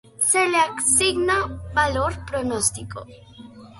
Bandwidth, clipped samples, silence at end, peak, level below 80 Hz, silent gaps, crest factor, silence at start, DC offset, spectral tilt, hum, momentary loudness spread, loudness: 12 kHz; under 0.1%; 0 s; -4 dBFS; -42 dBFS; none; 18 dB; 0.2 s; under 0.1%; -2.5 dB/octave; none; 11 LU; -20 LUFS